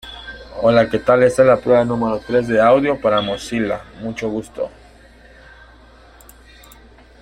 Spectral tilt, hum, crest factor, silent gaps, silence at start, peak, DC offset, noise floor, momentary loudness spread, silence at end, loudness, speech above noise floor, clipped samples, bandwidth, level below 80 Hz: -6 dB/octave; none; 18 dB; none; 0.05 s; -2 dBFS; under 0.1%; -45 dBFS; 16 LU; 2.55 s; -17 LUFS; 29 dB; under 0.1%; 14 kHz; -46 dBFS